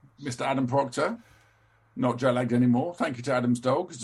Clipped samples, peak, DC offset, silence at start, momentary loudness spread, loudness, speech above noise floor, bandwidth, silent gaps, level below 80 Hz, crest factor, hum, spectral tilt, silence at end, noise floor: under 0.1%; -12 dBFS; under 0.1%; 0.2 s; 8 LU; -27 LUFS; 37 dB; 11.5 kHz; none; -66 dBFS; 16 dB; none; -6.5 dB/octave; 0 s; -63 dBFS